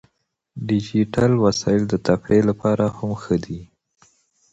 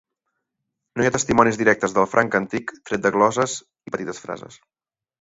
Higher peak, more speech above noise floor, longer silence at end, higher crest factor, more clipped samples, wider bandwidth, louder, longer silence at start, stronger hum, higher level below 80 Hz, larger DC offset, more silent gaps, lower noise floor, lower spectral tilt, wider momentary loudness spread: about the same, -2 dBFS vs 0 dBFS; second, 52 dB vs 60 dB; first, 0.9 s vs 0.65 s; about the same, 20 dB vs 22 dB; neither; about the same, 8.2 kHz vs 8 kHz; about the same, -20 LUFS vs -20 LUFS; second, 0.55 s vs 0.95 s; neither; about the same, -48 dBFS vs -52 dBFS; neither; neither; second, -71 dBFS vs -80 dBFS; first, -7 dB/octave vs -4.5 dB/octave; about the same, 14 LU vs 15 LU